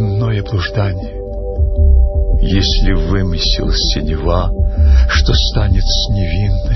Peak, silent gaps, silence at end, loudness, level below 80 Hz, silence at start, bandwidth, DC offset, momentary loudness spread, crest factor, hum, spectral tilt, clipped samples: 0 dBFS; none; 0 s; -15 LUFS; -14 dBFS; 0 s; 6.2 kHz; under 0.1%; 6 LU; 12 dB; none; -5.5 dB/octave; under 0.1%